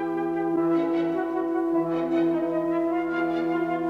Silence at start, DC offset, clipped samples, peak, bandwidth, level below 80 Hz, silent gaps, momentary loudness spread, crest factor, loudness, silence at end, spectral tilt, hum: 0 s; under 0.1%; under 0.1%; -12 dBFS; 5.2 kHz; -62 dBFS; none; 3 LU; 12 dB; -25 LUFS; 0 s; -8 dB/octave; none